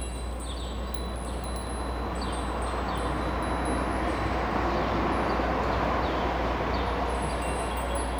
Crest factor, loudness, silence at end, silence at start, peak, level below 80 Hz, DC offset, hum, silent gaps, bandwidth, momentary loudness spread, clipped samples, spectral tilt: 14 dB; -29 LUFS; 0 s; 0 s; -14 dBFS; -34 dBFS; under 0.1%; none; none; over 20 kHz; 7 LU; under 0.1%; -5.5 dB/octave